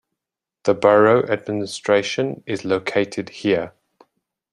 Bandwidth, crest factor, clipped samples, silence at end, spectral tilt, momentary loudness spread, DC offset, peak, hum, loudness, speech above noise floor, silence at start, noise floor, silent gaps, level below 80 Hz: 11 kHz; 18 dB; under 0.1%; 0.85 s; -5.5 dB/octave; 12 LU; under 0.1%; -2 dBFS; none; -20 LUFS; 67 dB; 0.65 s; -86 dBFS; none; -62 dBFS